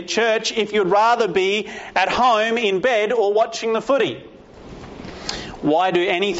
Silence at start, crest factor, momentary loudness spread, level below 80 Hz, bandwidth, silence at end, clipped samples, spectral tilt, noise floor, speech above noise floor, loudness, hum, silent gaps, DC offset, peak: 0 s; 14 dB; 13 LU; -50 dBFS; 8 kHz; 0 s; under 0.1%; -2 dB/octave; -39 dBFS; 21 dB; -19 LUFS; none; none; under 0.1%; -4 dBFS